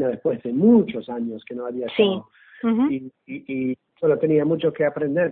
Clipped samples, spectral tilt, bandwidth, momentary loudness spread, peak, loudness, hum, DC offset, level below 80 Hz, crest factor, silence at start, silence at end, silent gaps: under 0.1%; -11.5 dB/octave; 4.1 kHz; 13 LU; -4 dBFS; -22 LUFS; none; under 0.1%; -64 dBFS; 16 dB; 0 s; 0 s; none